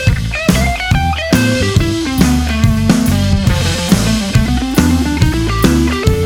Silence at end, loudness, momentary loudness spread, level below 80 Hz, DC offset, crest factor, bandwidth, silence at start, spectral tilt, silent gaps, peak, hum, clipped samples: 0 s; -13 LUFS; 2 LU; -20 dBFS; under 0.1%; 12 dB; 17.5 kHz; 0 s; -5.5 dB/octave; none; 0 dBFS; none; under 0.1%